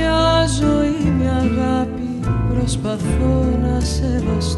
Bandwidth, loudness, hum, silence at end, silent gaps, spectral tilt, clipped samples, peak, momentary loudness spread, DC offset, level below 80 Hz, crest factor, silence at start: 11.5 kHz; -18 LUFS; none; 0 s; none; -6 dB/octave; under 0.1%; -4 dBFS; 6 LU; under 0.1%; -24 dBFS; 14 dB; 0 s